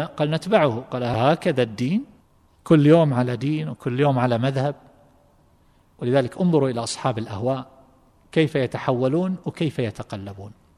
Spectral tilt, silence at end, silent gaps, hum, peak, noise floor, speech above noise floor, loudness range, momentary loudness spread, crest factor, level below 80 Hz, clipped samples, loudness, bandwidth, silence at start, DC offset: -7 dB/octave; 0.3 s; none; none; -2 dBFS; -58 dBFS; 36 dB; 5 LU; 11 LU; 20 dB; -58 dBFS; under 0.1%; -22 LUFS; 11.5 kHz; 0 s; under 0.1%